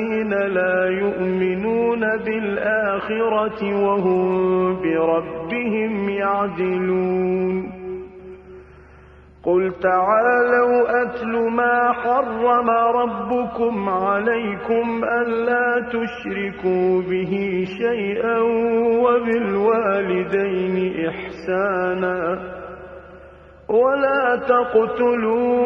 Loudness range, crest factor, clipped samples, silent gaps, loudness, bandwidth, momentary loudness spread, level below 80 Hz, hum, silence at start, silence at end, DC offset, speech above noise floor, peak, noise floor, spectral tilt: 5 LU; 14 dB; under 0.1%; none; -20 LUFS; 5.8 kHz; 8 LU; -52 dBFS; none; 0 s; 0 s; under 0.1%; 26 dB; -4 dBFS; -46 dBFS; -8.5 dB/octave